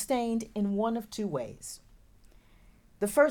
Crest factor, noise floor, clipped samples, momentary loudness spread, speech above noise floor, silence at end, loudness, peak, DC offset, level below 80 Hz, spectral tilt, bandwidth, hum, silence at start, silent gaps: 20 dB; -58 dBFS; under 0.1%; 14 LU; 29 dB; 0 s; -32 LUFS; -10 dBFS; under 0.1%; -60 dBFS; -5 dB/octave; 19 kHz; none; 0 s; none